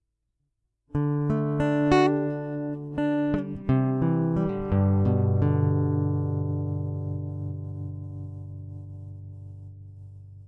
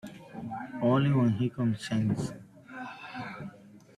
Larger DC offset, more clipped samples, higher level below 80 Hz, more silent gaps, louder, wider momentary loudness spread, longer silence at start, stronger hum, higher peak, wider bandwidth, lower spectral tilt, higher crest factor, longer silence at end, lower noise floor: neither; neither; first, -50 dBFS vs -64 dBFS; neither; first, -26 LUFS vs -30 LUFS; about the same, 19 LU vs 19 LU; first, 0.95 s vs 0.05 s; neither; first, -8 dBFS vs -14 dBFS; second, 7.8 kHz vs 12 kHz; first, -9 dB/octave vs -7.5 dB/octave; about the same, 18 dB vs 18 dB; second, 0 s vs 0.2 s; first, -77 dBFS vs -51 dBFS